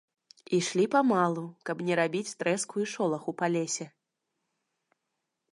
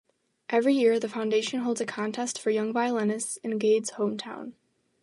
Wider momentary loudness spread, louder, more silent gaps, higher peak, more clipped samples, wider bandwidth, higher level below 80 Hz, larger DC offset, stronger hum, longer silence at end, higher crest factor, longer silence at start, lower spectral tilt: about the same, 10 LU vs 11 LU; about the same, -29 LUFS vs -27 LUFS; neither; about the same, -12 dBFS vs -12 dBFS; neither; about the same, 11.5 kHz vs 11.5 kHz; about the same, -82 dBFS vs -80 dBFS; neither; neither; first, 1.65 s vs 0.5 s; about the same, 20 dB vs 16 dB; about the same, 0.5 s vs 0.5 s; about the same, -4.5 dB/octave vs -4 dB/octave